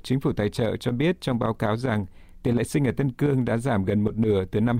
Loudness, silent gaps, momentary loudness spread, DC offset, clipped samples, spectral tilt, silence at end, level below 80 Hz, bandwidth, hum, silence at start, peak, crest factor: -25 LUFS; none; 3 LU; under 0.1%; under 0.1%; -7.5 dB/octave; 0 s; -46 dBFS; 16 kHz; none; 0.05 s; -10 dBFS; 14 dB